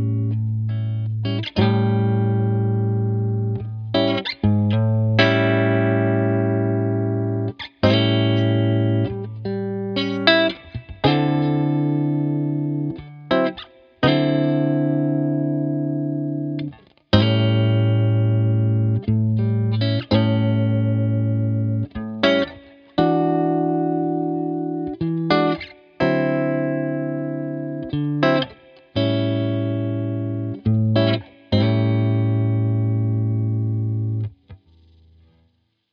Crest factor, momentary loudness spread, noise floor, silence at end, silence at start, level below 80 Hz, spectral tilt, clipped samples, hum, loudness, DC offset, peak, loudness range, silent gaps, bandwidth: 20 dB; 8 LU; -64 dBFS; 1.35 s; 0 s; -48 dBFS; -9 dB/octave; under 0.1%; none; -21 LUFS; under 0.1%; 0 dBFS; 3 LU; none; 5.4 kHz